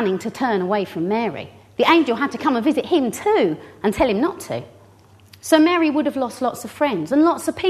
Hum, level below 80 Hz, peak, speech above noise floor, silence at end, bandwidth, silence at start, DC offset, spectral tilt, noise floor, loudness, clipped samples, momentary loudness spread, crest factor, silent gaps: none; -52 dBFS; 0 dBFS; 30 dB; 0 s; 13.5 kHz; 0 s; under 0.1%; -5 dB/octave; -49 dBFS; -19 LUFS; under 0.1%; 10 LU; 18 dB; none